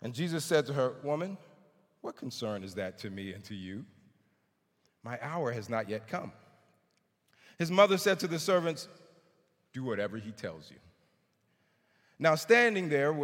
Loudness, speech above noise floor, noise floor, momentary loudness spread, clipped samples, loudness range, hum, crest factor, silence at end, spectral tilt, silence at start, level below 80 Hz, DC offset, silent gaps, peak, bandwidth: -31 LUFS; 45 dB; -76 dBFS; 20 LU; under 0.1%; 11 LU; none; 24 dB; 0 s; -5 dB/octave; 0 s; -80 dBFS; under 0.1%; none; -10 dBFS; 17 kHz